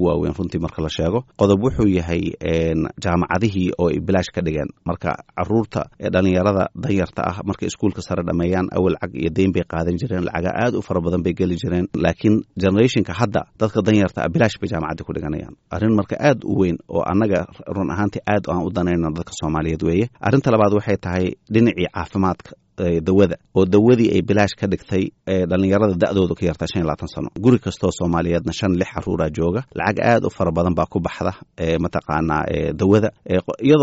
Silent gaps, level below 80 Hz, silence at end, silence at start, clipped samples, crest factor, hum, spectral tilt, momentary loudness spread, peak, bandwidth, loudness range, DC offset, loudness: none; -40 dBFS; 0 s; 0 s; under 0.1%; 16 dB; none; -6.5 dB/octave; 8 LU; -2 dBFS; 8 kHz; 3 LU; under 0.1%; -20 LUFS